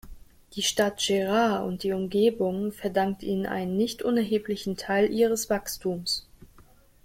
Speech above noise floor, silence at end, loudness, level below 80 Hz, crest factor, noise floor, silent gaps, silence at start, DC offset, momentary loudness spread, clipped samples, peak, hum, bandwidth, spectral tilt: 29 dB; 0.6 s; -26 LUFS; -54 dBFS; 18 dB; -55 dBFS; none; 0.05 s; under 0.1%; 7 LU; under 0.1%; -10 dBFS; none; 16.5 kHz; -4 dB/octave